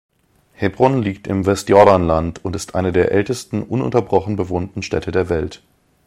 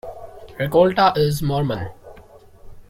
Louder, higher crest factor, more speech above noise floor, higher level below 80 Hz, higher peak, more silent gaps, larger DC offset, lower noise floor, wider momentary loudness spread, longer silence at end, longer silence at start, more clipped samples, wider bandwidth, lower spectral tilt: about the same, -17 LUFS vs -19 LUFS; about the same, 18 dB vs 18 dB; first, 36 dB vs 27 dB; about the same, -40 dBFS vs -44 dBFS; first, 0 dBFS vs -4 dBFS; neither; neither; first, -52 dBFS vs -45 dBFS; second, 12 LU vs 22 LU; first, 0.5 s vs 0.1 s; first, 0.6 s vs 0.05 s; neither; about the same, 15.5 kHz vs 16.5 kHz; about the same, -6.5 dB/octave vs -6.5 dB/octave